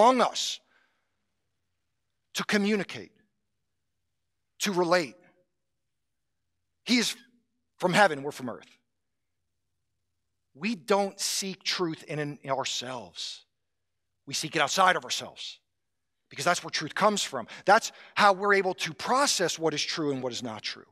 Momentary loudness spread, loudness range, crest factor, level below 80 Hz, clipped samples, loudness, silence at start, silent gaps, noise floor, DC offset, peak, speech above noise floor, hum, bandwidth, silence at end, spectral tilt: 15 LU; 8 LU; 22 dB; -80 dBFS; under 0.1%; -27 LUFS; 0 s; none; -86 dBFS; under 0.1%; -6 dBFS; 58 dB; none; 15.5 kHz; 0.1 s; -3 dB/octave